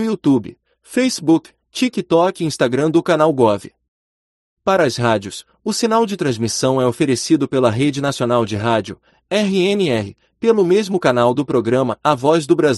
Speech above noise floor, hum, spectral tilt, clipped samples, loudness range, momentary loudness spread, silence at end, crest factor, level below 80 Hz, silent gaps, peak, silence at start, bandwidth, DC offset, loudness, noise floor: over 74 dB; none; -5.5 dB/octave; under 0.1%; 2 LU; 7 LU; 0 s; 16 dB; -56 dBFS; 3.88-4.57 s; 0 dBFS; 0 s; 12 kHz; under 0.1%; -17 LUFS; under -90 dBFS